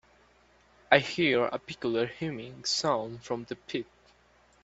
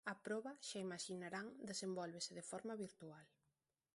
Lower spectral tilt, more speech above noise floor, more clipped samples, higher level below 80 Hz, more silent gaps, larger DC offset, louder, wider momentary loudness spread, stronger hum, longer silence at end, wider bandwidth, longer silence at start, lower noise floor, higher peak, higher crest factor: about the same, -4 dB/octave vs -3.5 dB/octave; second, 33 dB vs 40 dB; neither; first, -66 dBFS vs -90 dBFS; neither; neither; first, -29 LUFS vs -49 LUFS; first, 12 LU vs 7 LU; neither; first, 0.8 s vs 0.65 s; second, 8.4 kHz vs 11.5 kHz; first, 0.9 s vs 0.05 s; second, -63 dBFS vs -89 dBFS; first, -4 dBFS vs -32 dBFS; first, 26 dB vs 18 dB